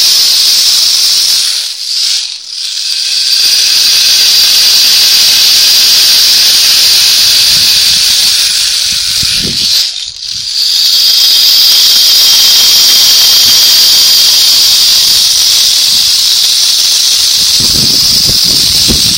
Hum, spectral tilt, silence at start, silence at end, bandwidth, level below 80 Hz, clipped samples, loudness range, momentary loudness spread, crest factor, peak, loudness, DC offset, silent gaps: none; 1.5 dB/octave; 0 s; 0 s; over 20 kHz; -36 dBFS; 3%; 5 LU; 7 LU; 6 dB; 0 dBFS; -3 LUFS; 0.2%; none